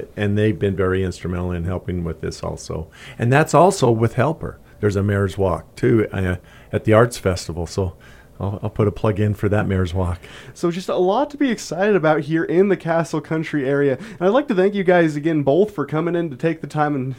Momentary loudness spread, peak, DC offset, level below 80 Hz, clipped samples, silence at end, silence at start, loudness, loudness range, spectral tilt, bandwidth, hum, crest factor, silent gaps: 11 LU; 0 dBFS; under 0.1%; -46 dBFS; under 0.1%; 0 s; 0 s; -20 LUFS; 4 LU; -7 dB/octave; 16 kHz; none; 18 dB; none